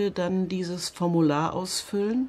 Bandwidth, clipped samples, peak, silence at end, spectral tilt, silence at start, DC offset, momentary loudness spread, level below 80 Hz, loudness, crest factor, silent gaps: 14 kHz; under 0.1%; -12 dBFS; 0 s; -5.5 dB/octave; 0 s; under 0.1%; 6 LU; -60 dBFS; -26 LUFS; 14 dB; none